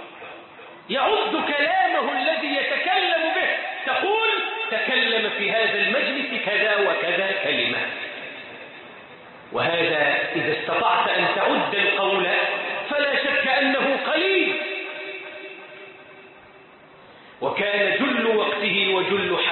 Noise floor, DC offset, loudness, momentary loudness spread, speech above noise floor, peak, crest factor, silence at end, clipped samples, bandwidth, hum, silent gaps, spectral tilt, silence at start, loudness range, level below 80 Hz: -48 dBFS; under 0.1%; -21 LUFS; 17 LU; 26 dB; -8 dBFS; 16 dB; 0 s; under 0.1%; 4.4 kHz; none; none; -8 dB/octave; 0 s; 5 LU; -68 dBFS